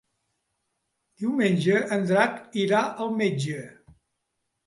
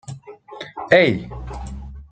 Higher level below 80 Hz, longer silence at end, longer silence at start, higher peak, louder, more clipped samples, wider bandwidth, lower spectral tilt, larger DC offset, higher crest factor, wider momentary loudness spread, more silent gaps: second, -70 dBFS vs -38 dBFS; first, 0.95 s vs 0.05 s; first, 1.2 s vs 0.05 s; second, -8 dBFS vs -2 dBFS; second, -25 LUFS vs -17 LUFS; neither; first, 11.5 kHz vs 9 kHz; about the same, -6 dB/octave vs -6 dB/octave; neither; about the same, 18 dB vs 20 dB; second, 10 LU vs 23 LU; neither